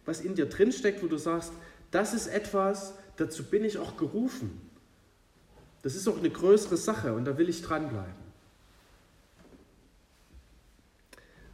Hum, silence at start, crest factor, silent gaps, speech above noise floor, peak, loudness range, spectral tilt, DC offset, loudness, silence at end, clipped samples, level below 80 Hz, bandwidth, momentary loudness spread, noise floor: none; 0.05 s; 20 dB; none; 33 dB; -10 dBFS; 6 LU; -5.5 dB/octave; under 0.1%; -30 LUFS; 0 s; under 0.1%; -60 dBFS; 15 kHz; 15 LU; -63 dBFS